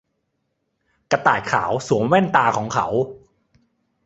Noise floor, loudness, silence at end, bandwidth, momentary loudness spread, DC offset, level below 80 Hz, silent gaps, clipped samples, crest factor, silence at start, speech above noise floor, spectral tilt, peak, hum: -73 dBFS; -19 LUFS; 0.9 s; 8.2 kHz; 7 LU; under 0.1%; -56 dBFS; none; under 0.1%; 20 dB; 1.1 s; 54 dB; -5.5 dB/octave; -2 dBFS; none